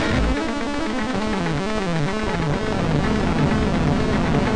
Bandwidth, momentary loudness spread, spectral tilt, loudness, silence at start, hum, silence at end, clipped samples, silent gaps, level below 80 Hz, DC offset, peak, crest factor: 10.5 kHz; 4 LU; -6.5 dB/octave; -22 LUFS; 0 s; none; 0 s; under 0.1%; none; -30 dBFS; under 0.1%; -6 dBFS; 14 dB